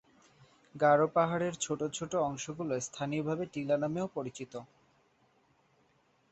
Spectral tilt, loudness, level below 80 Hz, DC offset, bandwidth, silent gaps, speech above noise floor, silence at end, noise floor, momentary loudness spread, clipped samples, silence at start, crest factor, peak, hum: -5 dB/octave; -32 LUFS; -72 dBFS; under 0.1%; 8.4 kHz; none; 38 dB; 1.65 s; -70 dBFS; 15 LU; under 0.1%; 0.75 s; 20 dB; -14 dBFS; none